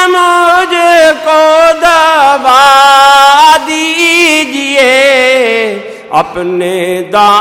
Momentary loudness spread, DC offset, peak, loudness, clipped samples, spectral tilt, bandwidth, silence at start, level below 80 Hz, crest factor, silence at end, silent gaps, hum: 10 LU; under 0.1%; 0 dBFS; -6 LUFS; 2%; -2 dB/octave; 17 kHz; 0 s; -44 dBFS; 6 dB; 0 s; none; none